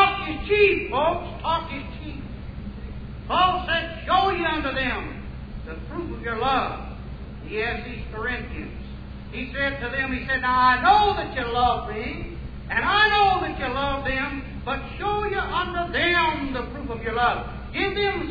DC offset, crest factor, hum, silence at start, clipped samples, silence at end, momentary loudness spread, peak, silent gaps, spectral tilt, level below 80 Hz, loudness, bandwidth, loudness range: under 0.1%; 18 dB; none; 0 s; under 0.1%; 0 s; 18 LU; -6 dBFS; none; -7 dB/octave; -38 dBFS; -23 LUFS; 5 kHz; 7 LU